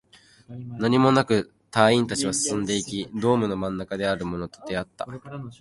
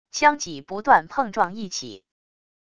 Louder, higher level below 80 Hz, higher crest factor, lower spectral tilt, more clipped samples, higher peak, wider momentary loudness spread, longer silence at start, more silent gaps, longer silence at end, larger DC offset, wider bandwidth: about the same, -24 LUFS vs -22 LUFS; first, -54 dBFS vs -60 dBFS; about the same, 22 dB vs 22 dB; first, -4.5 dB/octave vs -2.5 dB/octave; neither; about the same, -2 dBFS vs -2 dBFS; first, 17 LU vs 13 LU; first, 0.5 s vs 0.15 s; neither; second, 0.05 s vs 0.8 s; second, under 0.1% vs 0.4%; first, 11.5 kHz vs 10 kHz